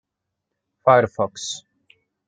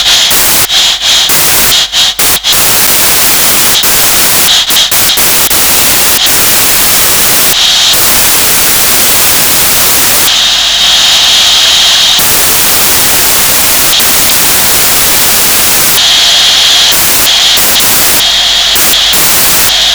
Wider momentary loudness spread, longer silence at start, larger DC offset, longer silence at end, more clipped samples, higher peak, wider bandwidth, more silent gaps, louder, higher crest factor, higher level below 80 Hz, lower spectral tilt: first, 14 LU vs 1 LU; first, 0.85 s vs 0 s; neither; first, 0.7 s vs 0 s; second, under 0.1% vs 3%; about the same, -2 dBFS vs 0 dBFS; second, 9.4 kHz vs over 20 kHz; neither; second, -20 LUFS vs -2 LUFS; first, 22 dB vs 6 dB; second, -66 dBFS vs -32 dBFS; first, -4 dB/octave vs 0.5 dB/octave